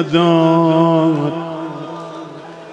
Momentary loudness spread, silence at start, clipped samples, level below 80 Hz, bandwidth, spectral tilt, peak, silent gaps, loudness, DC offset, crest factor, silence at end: 19 LU; 0 s; under 0.1%; -60 dBFS; 8 kHz; -8 dB/octave; 0 dBFS; none; -14 LUFS; under 0.1%; 14 dB; 0 s